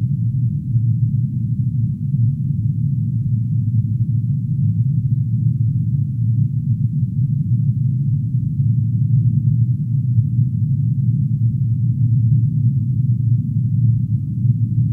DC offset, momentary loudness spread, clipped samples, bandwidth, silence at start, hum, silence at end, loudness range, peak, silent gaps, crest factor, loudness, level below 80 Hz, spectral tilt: under 0.1%; 3 LU; under 0.1%; 0.4 kHz; 0 s; none; 0 s; 2 LU; -4 dBFS; none; 12 dB; -18 LUFS; -40 dBFS; -13.5 dB/octave